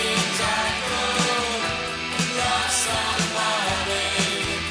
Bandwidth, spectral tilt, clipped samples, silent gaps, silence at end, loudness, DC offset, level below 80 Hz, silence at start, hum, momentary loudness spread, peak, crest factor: 11 kHz; -2 dB/octave; under 0.1%; none; 0 s; -22 LUFS; under 0.1%; -44 dBFS; 0 s; none; 4 LU; -8 dBFS; 16 dB